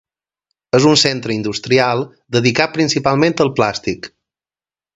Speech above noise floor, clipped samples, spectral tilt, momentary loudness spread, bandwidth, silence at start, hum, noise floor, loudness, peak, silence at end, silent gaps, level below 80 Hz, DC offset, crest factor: over 75 dB; under 0.1%; -4.5 dB/octave; 11 LU; 8.2 kHz; 0.75 s; none; under -90 dBFS; -15 LUFS; 0 dBFS; 0.9 s; none; -52 dBFS; under 0.1%; 16 dB